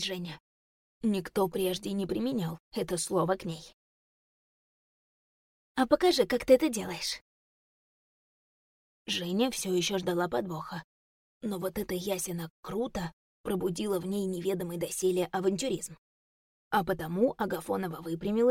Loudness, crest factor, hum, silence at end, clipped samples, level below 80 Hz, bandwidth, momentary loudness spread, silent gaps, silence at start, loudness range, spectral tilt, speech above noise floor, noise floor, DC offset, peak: -31 LUFS; 22 dB; none; 0 s; under 0.1%; -60 dBFS; 17 kHz; 13 LU; 0.40-1.01 s, 2.60-2.71 s, 3.74-5.75 s, 7.21-9.05 s, 10.84-11.41 s, 12.50-12.63 s, 13.13-13.44 s, 15.98-16.71 s; 0 s; 6 LU; -4.5 dB/octave; over 60 dB; under -90 dBFS; under 0.1%; -10 dBFS